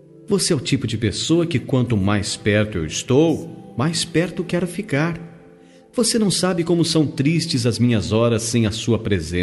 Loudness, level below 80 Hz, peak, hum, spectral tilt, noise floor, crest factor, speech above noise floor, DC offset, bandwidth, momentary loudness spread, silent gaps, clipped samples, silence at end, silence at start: -20 LUFS; -48 dBFS; -4 dBFS; none; -5 dB/octave; -47 dBFS; 16 dB; 28 dB; under 0.1%; 12 kHz; 6 LU; none; under 0.1%; 0 s; 0.2 s